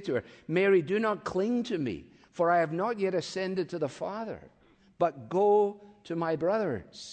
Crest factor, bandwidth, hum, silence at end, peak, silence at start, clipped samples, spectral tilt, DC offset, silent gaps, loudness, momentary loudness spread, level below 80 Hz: 16 dB; 9 kHz; none; 0 s; -12 dBFS; 0 s; under 0.1%; -6.5 dB/octave; under 0.1%; none; -29 LUFS; 13 LU; -68 dBFS